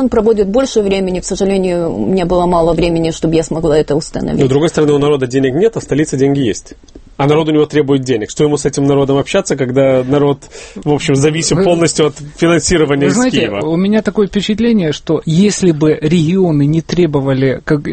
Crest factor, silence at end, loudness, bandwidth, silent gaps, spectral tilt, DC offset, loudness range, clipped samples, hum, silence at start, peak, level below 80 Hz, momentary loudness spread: 12 dB; 0 s; -13 LUFS; 8.8 kHz; none; -5.5 dB/octave; under 0.1%; 1 LU; under 0.1%; none; 0 s; 0 dBFS; -34 dBFS; 5 LU